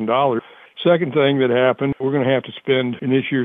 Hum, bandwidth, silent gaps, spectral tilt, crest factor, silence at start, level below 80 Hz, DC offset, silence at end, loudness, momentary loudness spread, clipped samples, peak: none; 3.9 kHz; none; -9.5 dB/octave; 14 dB; 0 s; -60 dBFS; under 0.1%; 0 s; -19 LUFS; 5 LU; under 0.1%; -4 dBFS